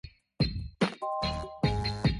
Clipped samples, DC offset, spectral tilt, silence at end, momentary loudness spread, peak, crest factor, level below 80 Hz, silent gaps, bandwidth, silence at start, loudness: under 0.1%; under 0.1%; -6.5 dB/octave; 0 s; 3 LU; -12 dBFS; 18 dB; -40 dBFS; none; 11.5 kHz; 0.05 s; -32 LUFS